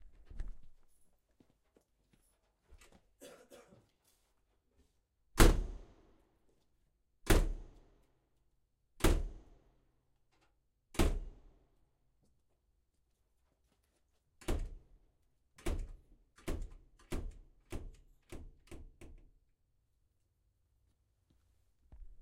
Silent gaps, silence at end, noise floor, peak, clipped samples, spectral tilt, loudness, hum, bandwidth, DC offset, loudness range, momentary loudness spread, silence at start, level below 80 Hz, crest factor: none; 0.05 s; -78 dBFS; -10 dBFS; under 0.1%; -5 dB/octave; -37 LUFS; none; 16 kHz; under 0.1%; 20 LU; 25 LU; 0.05 s; -42 dBFS; 30 dB